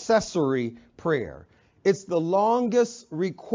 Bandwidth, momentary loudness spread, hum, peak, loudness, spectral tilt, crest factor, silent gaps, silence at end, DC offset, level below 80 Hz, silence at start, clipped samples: 7.6 kHz; 8 LU; none; -10 dBFS; -25 LUFS; -5.5 dB/octave; 16 dB; none; 0 s; under 0.1%; -58 dBFS; 0 s; under 0.1%